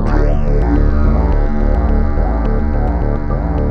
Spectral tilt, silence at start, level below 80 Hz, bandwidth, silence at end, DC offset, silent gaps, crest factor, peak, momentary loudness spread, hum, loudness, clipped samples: -10 dB/octave; 0 s; -14 dBFS; 5.2 kHz; 0 s; under 0.1%; none; 10 dB; -2 dBFS; 4 LU; none; -16 LUFS; under 0.1%